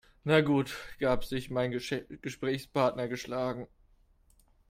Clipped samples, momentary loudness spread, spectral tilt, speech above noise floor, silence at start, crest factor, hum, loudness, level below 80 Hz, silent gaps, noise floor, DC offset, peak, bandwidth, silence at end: under 0.1%; 11 LU; -6 dB/octave; 34 dB; 0.25 s; 22 dB; none; -31 LUFS; -54 dBFS; none; -65 dBFS; under 0.1%; -10 dBFS; 16 kHz; 1.05 s